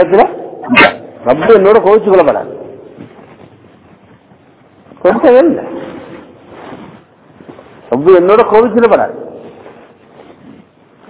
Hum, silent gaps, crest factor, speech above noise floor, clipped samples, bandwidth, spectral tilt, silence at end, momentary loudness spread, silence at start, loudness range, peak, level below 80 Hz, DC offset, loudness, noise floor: none; none; 12 dB; 36 dB; 3%; 4 kHz; -9.5 dB/octave; 1.6 s; 23 LU; 0 s; 5 LU; 0 dBFS; -48 dBFS; under 0.1%; -9 LUFS; -44 dBFS